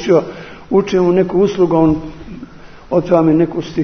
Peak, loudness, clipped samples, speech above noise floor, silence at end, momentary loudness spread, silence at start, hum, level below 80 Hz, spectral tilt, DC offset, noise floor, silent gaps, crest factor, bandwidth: 0 dBFS; -14 LUFS; under 0.1%; 22 dB; 0 s; 20 LU; 0 s; none; -40 dBFS; -8 dB/octave; under 0.1%; -35 dBFS; none; 14 dB; 6.6 kHz